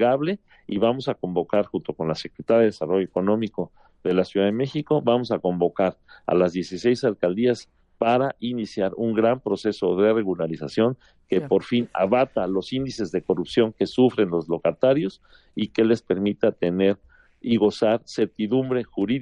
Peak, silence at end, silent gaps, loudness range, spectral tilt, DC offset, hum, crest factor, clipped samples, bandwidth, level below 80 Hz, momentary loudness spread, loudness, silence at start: -6 dBFS; 0 s; none; 1 LU; -7 dB/octave; under 0.1%; none; 18 dB; under 0.1%; 10 kHz; -60 dBFS; 8 LU; -23 LUFS; 0 s